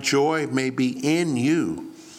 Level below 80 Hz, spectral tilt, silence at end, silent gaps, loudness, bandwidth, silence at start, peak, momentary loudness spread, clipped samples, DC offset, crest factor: -64 dBFS; -5 dB/octave; 0 s; none; -23 LUFS; 15 kHz; 0 s; -8 dBFS; 5 LU; under 0.1%; under 0.1%; 14 dB